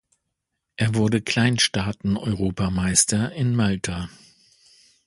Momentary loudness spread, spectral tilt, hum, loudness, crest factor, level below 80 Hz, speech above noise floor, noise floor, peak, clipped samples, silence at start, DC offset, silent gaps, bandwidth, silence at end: 10 LU; -4 dB/octave; none; -22 LUFS; 20 dB; -44 dBFS; 58 dB; -80 dBFS; -4 dBFS; under 0.1%; 0.8 s; under 0.1%; none; 11.5 kHz; 1 s